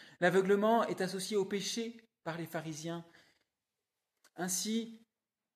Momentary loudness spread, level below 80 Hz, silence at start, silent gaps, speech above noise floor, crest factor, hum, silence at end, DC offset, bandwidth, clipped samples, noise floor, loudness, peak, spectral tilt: 15 LU; -84 dBFS; 0 s; none; over 56 dB; 18 dB; none; 0.6 s; under 0.1%; 14.5 kHz; under 0.1%; under -90 dBFS; -34 LUFS; -18 dBFS; -4 dB/octave